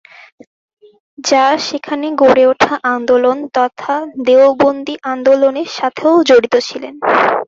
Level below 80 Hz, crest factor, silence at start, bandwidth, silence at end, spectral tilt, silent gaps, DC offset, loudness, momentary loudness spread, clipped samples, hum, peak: -56 dBFS; 12 dB; 1.2 s; 7.6 kHz; 0.05 s; -3.5 dB/octave; none; under 0.1%; -13 LUFS; 10 LU; under 0.1%; none; 0 dBFS